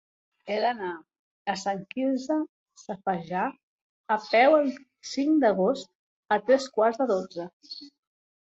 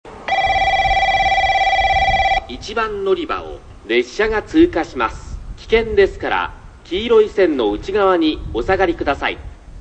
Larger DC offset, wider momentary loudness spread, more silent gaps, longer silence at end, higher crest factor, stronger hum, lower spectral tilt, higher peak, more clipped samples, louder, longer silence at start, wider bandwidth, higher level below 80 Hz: neither; first, 18 LU vs 10 LU; first, 1.19-1.45 s, 2.49-2.66 s, 3.63-4.04 s, 5.95-6.23 s, 7.53-7.60 s vs none; first, 0.7 s vs 0 s; about the same, 18 dB vs 16 dB; neither; about the same, -5 dB/octave vs -5 dB/octave; second, -8 dBFS vs -2 dBFS; neither; second, -26 LUFS vs -17 LUFS; first, 0.45 s vs 0.05 s; about the same, 8.2 kHz vs 8.8 kHz; second, -74 dBFS vs -32 dBFS